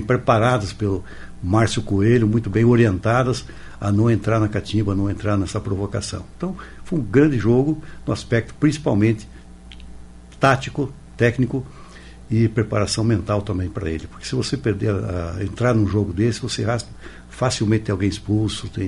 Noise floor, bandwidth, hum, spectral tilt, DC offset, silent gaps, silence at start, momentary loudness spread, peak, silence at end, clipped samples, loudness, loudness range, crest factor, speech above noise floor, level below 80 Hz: -40 dBFS; 11.5 kHz; none; -6.5 dB/octave; under 0.1%; none; 0 s; 11 LU; -2 dBFS; 0 s; under 0.1%; -21 LUFS; 4 LU; 18 dB; 20 dB; -40 dBFS